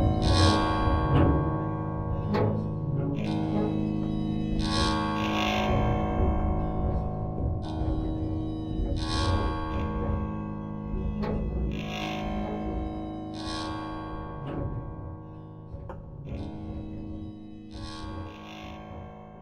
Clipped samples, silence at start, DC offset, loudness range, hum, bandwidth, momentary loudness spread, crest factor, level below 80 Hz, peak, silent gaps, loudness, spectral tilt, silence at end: under 0.1%; 0 s; under 0.1%; 12 LU; none; 11 kHz; 16 LU; 20 dB; -36 dBFS; -8 dBFS; none; -29 LUFS; -6.5 dB/octave; 0 s